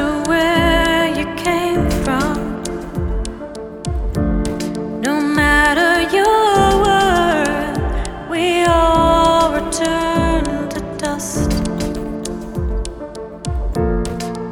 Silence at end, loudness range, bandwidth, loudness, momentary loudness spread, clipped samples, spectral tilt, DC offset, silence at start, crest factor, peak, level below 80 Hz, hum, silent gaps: 0 s; 8 LU; 18 kHz; -17 LUFS; 12 LU; under 0.1%; -5 dB/octave; under 0.1%; 0 s; 14 dB; -2 dBFS; -26 dBFS; none; none